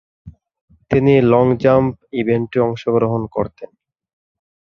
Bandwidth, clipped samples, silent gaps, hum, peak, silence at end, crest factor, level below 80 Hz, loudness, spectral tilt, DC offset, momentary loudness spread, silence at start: 6.6 kHz; under 0.1%; 0.61-0.68 s; none; -2 dBFS; 1.05 s; 16 dB; -46 dBFS; -16 LUFS; -9.5 dB/octave; under 0.1%; 10 LU; 0.25 s